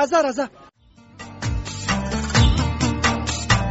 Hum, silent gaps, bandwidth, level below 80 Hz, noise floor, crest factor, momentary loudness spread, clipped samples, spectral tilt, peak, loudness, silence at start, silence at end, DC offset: none; none; 8.2 kHz; -28 dBFS; -47 dBFS; 18 dB; 12 LU; under 0.1%; -4.5 dB/octave; -4 dBFS; -21 LUFS; 0 s; 0 s; under 0.1%